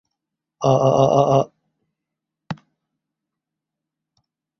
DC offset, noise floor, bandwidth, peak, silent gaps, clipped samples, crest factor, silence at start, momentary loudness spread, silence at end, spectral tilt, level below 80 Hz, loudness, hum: under 0.1%; -84 dBFS; 6.8 kHz; -2 dBFS; none; under 0.1%; 20 dB; 0.6 s; 20 LU; 2.05 s; -7 dB/octave; -56 dBFS; -17 LUFS; none